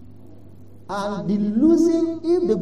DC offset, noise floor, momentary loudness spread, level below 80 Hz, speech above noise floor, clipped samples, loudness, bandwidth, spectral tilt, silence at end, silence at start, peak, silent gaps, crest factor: 0.8%; -46 dBFS; 11 LU; -56 dBFS; 27 dB; under 0.1%; -20 LUFS; 9.4 kHz; -7.5 dB/octave; 0 s; 0.9 s; -6 dBFS; none; 16 dB